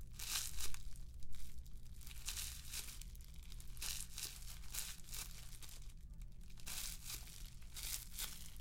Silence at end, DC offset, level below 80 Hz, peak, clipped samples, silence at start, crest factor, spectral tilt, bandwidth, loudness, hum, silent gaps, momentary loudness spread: 0 s; under 0.1%; -52 dBFS; -20 dBFS; under 0.1%; 0 s; 24 dB; -1 dB/octave; 17 kHz; -48 LUFS; none; none; 13 LU